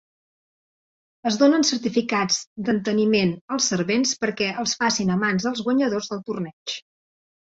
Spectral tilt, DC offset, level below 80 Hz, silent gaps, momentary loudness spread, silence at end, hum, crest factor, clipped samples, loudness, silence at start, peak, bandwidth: -3.5 dB/octave; under 0.1%; -62 dBFS; 2.47-2.56 s, 3.41-3.48 s, 6.53-6.66 s; 10 LU; 0.75 s; none; 18 dB; under 0.1%; -22 LUFS; 1.25 s; -4 dBFS; 8 kHz